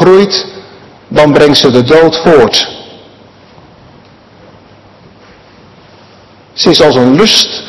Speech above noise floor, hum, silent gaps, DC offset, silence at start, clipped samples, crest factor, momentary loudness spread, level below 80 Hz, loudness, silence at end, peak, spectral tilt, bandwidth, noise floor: 33 dB; none; none; under 0.1%; 0 s; 4%; 10 dB; 11 LU; -40 dBFS; -6 LUFS; 0 s; 0 dBFS; -4.5 dB/octave; 12 kHz; -38 dBFS